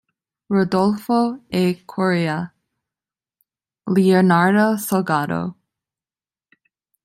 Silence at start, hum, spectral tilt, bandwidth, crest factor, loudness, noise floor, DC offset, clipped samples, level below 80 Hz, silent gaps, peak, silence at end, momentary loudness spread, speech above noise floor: 0.5 s; none; -6.5 dB/octave; 16 kHz; 18 dB; -19 LUFS; under -90 dBFS; under 0.1%; under 0.1%; -62 dBFS; none; -2 dBFS; 1.5 s; 11 LU; over 72 dB